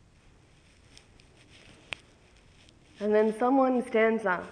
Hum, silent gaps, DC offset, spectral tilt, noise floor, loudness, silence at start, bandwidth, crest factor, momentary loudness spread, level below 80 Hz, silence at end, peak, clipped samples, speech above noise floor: none; none; under 0.1%; -6 dB/octave; -59 dBFS; -26 LUFS; 3 s; 10.5 kHz; 18 dB; 17 LU; -64 dBFS; 0 s; -12 dBFS; under 0.1%; 34 dB